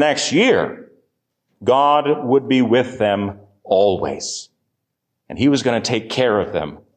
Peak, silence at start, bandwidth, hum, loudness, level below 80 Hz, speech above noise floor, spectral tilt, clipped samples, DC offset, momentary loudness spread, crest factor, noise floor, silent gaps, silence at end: -4 dBFS; 0 s; 9.4 kHz; none; -18 LUFS; -50 dBFS; 59 dB; -4.5 dB/octave; under 0.1%; under 0.1%; 11 LU; 14 dB; -77 dBFS; none; 0.2 s